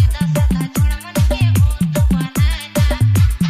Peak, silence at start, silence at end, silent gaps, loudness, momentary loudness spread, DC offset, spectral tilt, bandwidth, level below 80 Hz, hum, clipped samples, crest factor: -4 dBFS; 0 s; 0 s; none; -16 LUFS; 4 LU; under 0.1%; -6 dB/octave; 15.5 kHz; -20 dBFS; none; under 0.1%; 10 dB